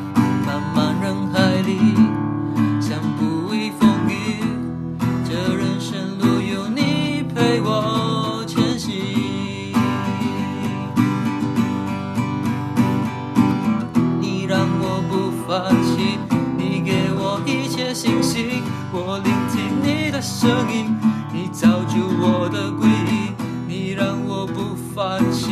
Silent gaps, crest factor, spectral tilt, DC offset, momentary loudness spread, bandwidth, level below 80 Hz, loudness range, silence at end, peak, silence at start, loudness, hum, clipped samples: none; 16 dB; -6 dB/octave; under 0.1%; 7 LU; 14 kHz; -54 dBFS; 3 LU; 0 s; -4 dBFS; 0 s; -20 LUFS; none; under 0.1%